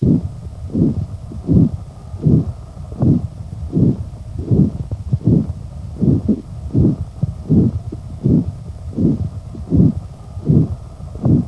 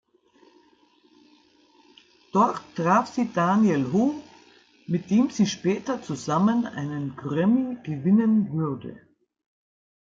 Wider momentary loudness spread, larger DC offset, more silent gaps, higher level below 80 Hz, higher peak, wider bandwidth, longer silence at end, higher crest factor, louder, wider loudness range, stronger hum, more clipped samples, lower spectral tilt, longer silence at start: first, 15 LU vs 10 LU; first, 0.2% vs under 0.1%; neither; first, -30 dBFS vs -70 dBFS; first, 0 dBFS vs -8 dBFS; first, 11 kHz vs 7.6 kHz; second, 0 s vs 1.1 s; about the same, 18 dB vs 18 dB; first, -18 LUFS vs -24 LUFS; about the same, 0 LU vs 2 LU; neither; neither; first, -11 dB/octave vs -7 dB/octave; second, 0 s vs 2.35 s